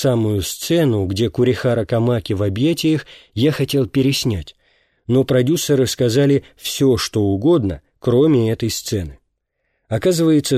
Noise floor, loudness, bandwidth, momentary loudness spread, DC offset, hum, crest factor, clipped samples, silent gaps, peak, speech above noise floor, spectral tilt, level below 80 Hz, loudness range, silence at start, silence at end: -71 dBFS; -18 LUFS; 15.5 kHz; 9 LU; under 0.1%; none; 12 dB; under 0.1%; none; -4 dBFS; 54 dB; -6 dB/octave; -44 dBFS; 2 LU; 0 s; 0 s